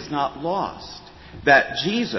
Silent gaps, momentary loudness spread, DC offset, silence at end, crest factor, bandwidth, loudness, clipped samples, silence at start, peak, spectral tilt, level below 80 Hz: none; 21 LU; under 0.1%; 0 s; 20 dB; 6.2 kHz; -21 LUFS; under 0.1%; 0 s; -2 dBFS; -4.5 dB/octave; -50 dBFS